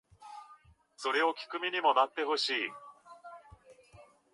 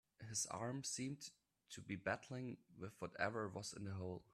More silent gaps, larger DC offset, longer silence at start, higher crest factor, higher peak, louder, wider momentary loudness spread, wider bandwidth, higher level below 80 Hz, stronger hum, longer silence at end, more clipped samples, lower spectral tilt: neither; neither; about the same, 0.2 s vs 0.2 s; about the same, 22 dB vs 22 dB; first, -12 dBFS vs -26 dBFS; first, -31 LUFS vs -47 LUFS; first, 24 LU vs 11 LU; second, 11.5 kHz vs 15 kHz; first, -72 dBFS vs -80 dBFS; neither; first, 0.3 s vs 0.1 s; neither; second, -2 dB/octave vs -3.5 dB/octave